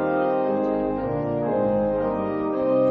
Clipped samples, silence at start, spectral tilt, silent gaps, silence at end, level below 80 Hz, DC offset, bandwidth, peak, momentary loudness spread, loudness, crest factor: under 0.1%; 0 s; -10.5 dB/octave; none; 0 s; -48 dBFS; under 0.1%; 4.6 kHz; -10 dBFS; 3 LU; -24 LUFS; 12 dB